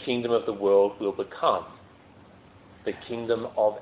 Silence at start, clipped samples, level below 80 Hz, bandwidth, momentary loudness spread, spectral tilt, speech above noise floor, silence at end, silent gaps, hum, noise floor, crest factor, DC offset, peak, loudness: 0 s; under 0.1%; -62 dBFS; 4 kHz; 13 LU; -9.5 dB/octave; 27 dB; 0 s; none; none; -52 dBFS; 18 dB; under 0.1%; -10 dBFS; -26 LUFS